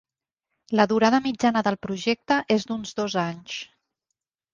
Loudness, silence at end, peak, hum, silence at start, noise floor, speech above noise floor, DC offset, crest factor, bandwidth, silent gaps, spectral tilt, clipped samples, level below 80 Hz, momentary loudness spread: -24 LUFS; 0.9 s; -4 dBFS; none; 0.7 s; -83 dBFS; 60 dB; under 0.1%; 20 dB; 7.4 kHz; none; -5 dB/octave; under 0.1%; -62 dBFS; 13 LU